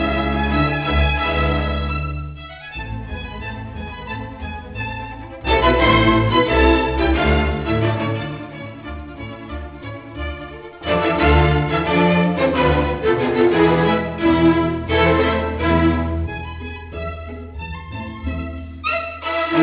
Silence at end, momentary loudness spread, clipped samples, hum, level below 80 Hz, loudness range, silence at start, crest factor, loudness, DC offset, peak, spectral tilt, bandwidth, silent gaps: 0 s; 17 LU; under 0.1%; none; -28 dBFS; 10 LU; 0 s; 18 dB; -18 LUFS; under 0.1%; -2 dBFS; -10.5 dB/octave; 4 kHz; none